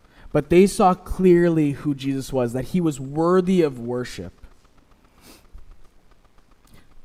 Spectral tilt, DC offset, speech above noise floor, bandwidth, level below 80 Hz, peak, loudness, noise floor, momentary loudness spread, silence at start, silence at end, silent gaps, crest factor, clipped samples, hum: -7 dB/octave; under 0.1%; 34 dB; 15 kHz; -42 dBFS; -4 dBFS; -20 LUFS; -54 dBFS; 12 LU; 0.25 s; 0.05 s; none; 18 dB; under 0.1%; none